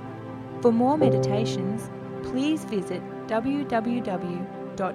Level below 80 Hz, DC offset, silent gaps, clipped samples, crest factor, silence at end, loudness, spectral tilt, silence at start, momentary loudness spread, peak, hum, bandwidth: -58 dBFS; under 0.1%; none; under 0.1%; 18 dB; 0 s; -26 LUFS; -7 dB/octave; 0 s; 14 LU; -8 dBFS; none; 13 kHz